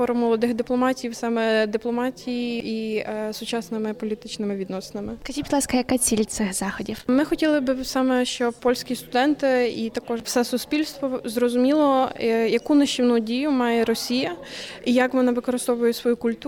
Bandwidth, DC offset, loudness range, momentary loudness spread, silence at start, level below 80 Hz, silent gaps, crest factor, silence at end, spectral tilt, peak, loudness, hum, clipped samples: 18 kHz; under 0.1%; 6 LU; 9 LU; 0 s; -52 dBFS; none; 16 dB; 0 s; -3.5 dB/octave; -8 dBFS; -23 LUFS; none; under 0.1%